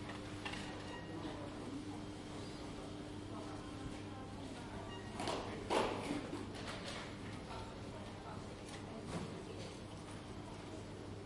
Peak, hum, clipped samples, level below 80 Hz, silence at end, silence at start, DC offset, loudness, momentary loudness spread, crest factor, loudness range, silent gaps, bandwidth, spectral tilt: -20 dBFS; none; under 0.1%; -60 dBFS; 0 s; 0 s; under 0.1%; -46 LUFS; 7 LU; 26 dB; 5 LU; none; 11.5 kHz; -5 dB/octave